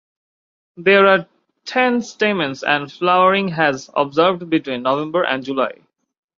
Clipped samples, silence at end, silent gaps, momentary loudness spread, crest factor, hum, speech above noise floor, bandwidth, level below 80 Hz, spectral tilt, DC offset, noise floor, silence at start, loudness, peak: under 0.1%; 0.65 s; none; 8 LU; 18 dB; none; over 73 dB; 7.6 kHz; -64 dBFS; -5 dB/octave; under 0.1%; under -90 dBFS; 0.8 s; -17 LUFS; -2 dBFS